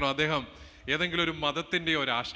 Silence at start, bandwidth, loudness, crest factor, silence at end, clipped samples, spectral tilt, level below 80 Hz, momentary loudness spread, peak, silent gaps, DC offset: 0 s; 8 kHz; -28 LUFS; 18 dB; 0 s; under 0.1%; -4.5 dB/octave; -54 dBFS; 7 LU; -12 dBFS; none; under 0.1%